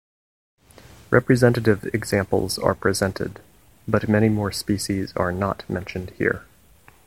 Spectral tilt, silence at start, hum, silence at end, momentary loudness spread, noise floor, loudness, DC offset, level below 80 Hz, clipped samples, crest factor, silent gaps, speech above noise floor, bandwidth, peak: -6 dB/octave; 1.1 s; none; 0.65 s; 11 LU; -53 dBFS; -22 LUFS; 0.2%; -48 dBFS; under 0.1%; 22 dB; none; 32 dB; 16.5 kHz; 0 dBFS